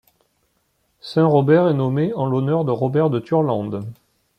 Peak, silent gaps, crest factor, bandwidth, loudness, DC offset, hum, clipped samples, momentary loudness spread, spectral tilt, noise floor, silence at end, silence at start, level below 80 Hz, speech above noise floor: -4 dBFS; none; 16 dB; 9.2 kHz; -19 LUFS; under 0.1%; none; under 0.1%; 13 LU; -9.5 dB/octave; -67 dBFS; 0.45 s; 1.05 s; -62 dBFS; 49 dB